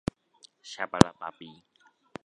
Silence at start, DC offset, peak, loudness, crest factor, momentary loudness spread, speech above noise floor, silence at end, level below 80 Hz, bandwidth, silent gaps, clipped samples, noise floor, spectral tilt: 0.65 s; under 0.1%; 0 dBFS; -26 LUFS; 30 dB; 25 LU; 34 dB; 0.75 s; -50 dBFS; 11 kHz; none; under 0.1%; -61 dBFS; -5.5 dB/octave